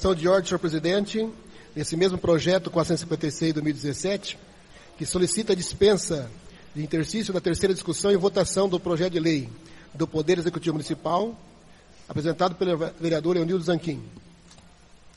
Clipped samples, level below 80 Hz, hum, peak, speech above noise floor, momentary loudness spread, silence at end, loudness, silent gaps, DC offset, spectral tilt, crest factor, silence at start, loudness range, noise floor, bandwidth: under 0.1%; -50 dBFS; none; -8 dBFS; 27 dB; 12 LU; 0.05 s; -25 LUFS; none; under 0.1%; -5 dB/octave; 18 dB; 0 s; 3 LU; -51 dBFS; 11.5 kHz